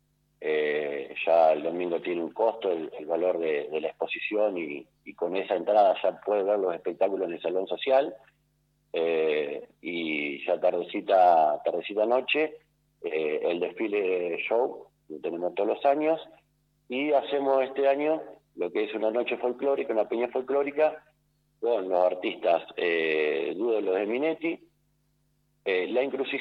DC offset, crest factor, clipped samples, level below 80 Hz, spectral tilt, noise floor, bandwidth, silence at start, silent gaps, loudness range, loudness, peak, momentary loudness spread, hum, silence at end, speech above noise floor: under 0.1%; 18 dB; under 0.1%; -76 dBFS; -6.5 dB/octave; -70 dBFS; 5.4 kHz; 0.4 s; none; 4 LU; -27 LUFS; -10 dBFS; 9 LU; none; 0 s; 44 dB